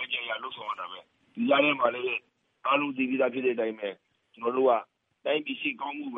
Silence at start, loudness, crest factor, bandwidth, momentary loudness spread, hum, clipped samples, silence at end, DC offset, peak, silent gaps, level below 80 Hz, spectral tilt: 0 s; -28 LUFS; 20 dB; 3.9 kHz; 13 LU; none; under 0.1%; 0 s; under 0.1%; -10 dBFS; none; -88 dBFS; -7 dB/octave